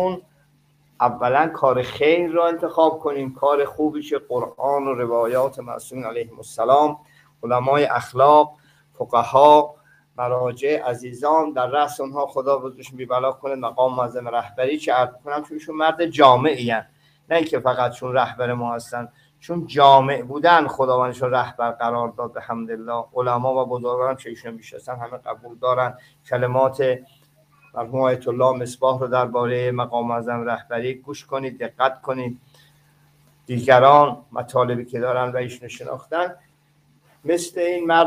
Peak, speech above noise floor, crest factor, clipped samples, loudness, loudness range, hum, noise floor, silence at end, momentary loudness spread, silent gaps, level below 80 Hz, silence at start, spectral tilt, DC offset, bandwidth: 0 dBFS; 39 dB; 20 dB; under 0.1%; -20 LUFS; 6 LU; none; -59 dBFS; 0 s; 16 LU; none; -64 dBFS; 0 s; -5.5 dB/octave; under 0.1%; 15.5 kHz